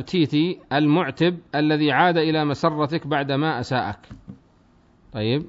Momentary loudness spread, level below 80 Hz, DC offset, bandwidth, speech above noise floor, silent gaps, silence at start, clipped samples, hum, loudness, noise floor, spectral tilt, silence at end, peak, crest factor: 8 LU; -56 dBFS; under 0.1%; 7.8 kHz; 35 dB; none; 0 s; under 0.1%; none; -21 LUFS; -56 dBFS; -7 dB/octave; 0 s; -4 dBFS; 18 dB